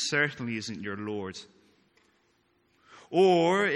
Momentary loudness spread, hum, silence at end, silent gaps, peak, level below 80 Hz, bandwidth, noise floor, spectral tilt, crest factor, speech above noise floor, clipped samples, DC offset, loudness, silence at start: 15 LU; none; 0 s; none; -12 dBFS; -74 dBFS; 11.5 kHz; -69 dBFS; -4.5 dB/octave; 18 dB; 42 dB; under 0.1%; under 0.1%; -27 LUFS; 0 s